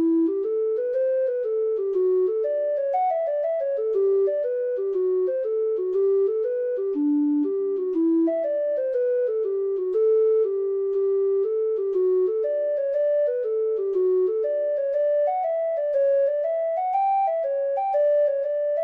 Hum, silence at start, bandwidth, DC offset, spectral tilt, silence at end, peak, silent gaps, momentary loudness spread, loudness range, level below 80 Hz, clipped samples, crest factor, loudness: none; 0 s; 3.3 kHz; under 0.1%; -7.5 dB/octave; 0 s; -14 dBFS; none; 4 LU; 1 LU; -76 dBFS; under 0.1%; 8 dB; -23 LUFS